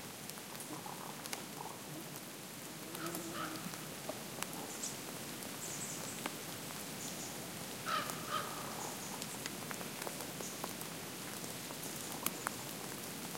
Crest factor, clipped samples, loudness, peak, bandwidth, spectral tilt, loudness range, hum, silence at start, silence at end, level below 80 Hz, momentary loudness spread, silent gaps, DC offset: 30 dB; under 0.1%; -43 LUFS; -14 dBFS; 17 kHz; -2.5 dB/octave; 3 LU; none; 0 s; 0 s; -76 dBFS; 6 LU; none; under 0.1%